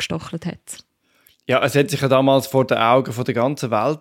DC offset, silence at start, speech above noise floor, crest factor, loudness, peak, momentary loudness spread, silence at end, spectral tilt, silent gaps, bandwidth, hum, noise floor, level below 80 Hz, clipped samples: under 0.1%; 0 s; 40 dB; 16 dB; -18 LUFS; -2 dBFS; 18 LU; 0.05 s; -5.5 dB/octave; none; 17 kHz; none; -58 dBFS; -58 dBFS; under 0.1%